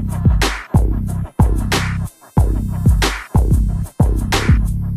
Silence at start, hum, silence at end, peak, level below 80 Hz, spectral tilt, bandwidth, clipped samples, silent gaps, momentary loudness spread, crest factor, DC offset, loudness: 0 s; none; 0 s; 0 dBFS; -18 dBFS; -5.5 dB/octave; 14.5 kHz; under 0.1%; none; 6 LU; 14 dB; under 0.1%; -17 LUFS